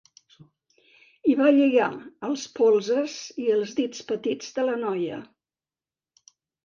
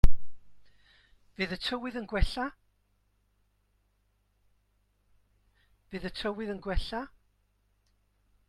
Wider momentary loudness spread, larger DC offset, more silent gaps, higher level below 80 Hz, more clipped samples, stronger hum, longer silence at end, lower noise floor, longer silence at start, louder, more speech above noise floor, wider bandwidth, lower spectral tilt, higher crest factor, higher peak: about the same, 12 LU vs 12 LU; neither; neither; second, -74 dBFS vs -36 dBFS; neither; second, none vs 50 Hz at -65 dBFS; about the same, 1.4 s vs 1.45 s; first, under -90 dBFS vs -72 dBFS; first, 1.25 s vs 0.05 s; first, -24 LUFS vs -35 LUFS; first, over 66 dB vs 40 dB; second, 7.4 kHz vs 9.6 kHz; second, -4.5 dB/octave vs -6 dB/octave; second, 18 dB vs 24 dB; second, -8 dBFS vs -4 dBFS